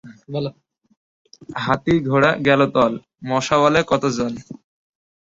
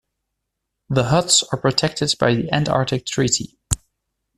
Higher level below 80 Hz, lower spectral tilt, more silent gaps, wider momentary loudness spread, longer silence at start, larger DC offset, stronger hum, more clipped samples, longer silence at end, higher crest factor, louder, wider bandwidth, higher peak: second, -52 dBFS vs -44 dBFS; first, -5.5 dB/octave vs -3.5 dB/octave; first, 0.97-1.25 s vs none; first, 14 LU vs 10 LU; second, 0.05 s vs 0.9 s; neither; neither; neither; about the same, 0.7 s vs 0.6 s; about the same, 18 dB vs 20 dB; about the same, -19 LUFS vs -19 LUFS; second, 8 kHz vs 14 kHz; about the same, -2 dBFS vs 0 dBFS